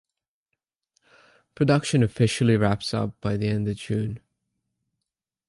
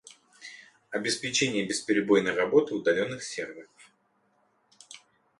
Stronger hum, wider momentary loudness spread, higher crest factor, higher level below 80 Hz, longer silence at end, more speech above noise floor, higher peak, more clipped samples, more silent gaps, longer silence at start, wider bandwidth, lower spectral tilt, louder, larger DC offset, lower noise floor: neither; second, 8 LU vs 24 LU; about the same, 20 dB vs 20 dB; first, -52 dBFS vs -70 dBFS; first, 1.3 s vs 0.4 s; first, 63 dB vs 43 dB; about the same, -6 dBFS vs -8 dBFS; neither; neither; first, 1.6 s vs 0.4 s; about the same, 11.5 kHz vs 11.5 kHz; first, -6.5 dB/octave vs -3.5 dB/octave; first, -24 LUFS vs -27 LUFS; neither; first, -85 dBFS vs -70 dBFS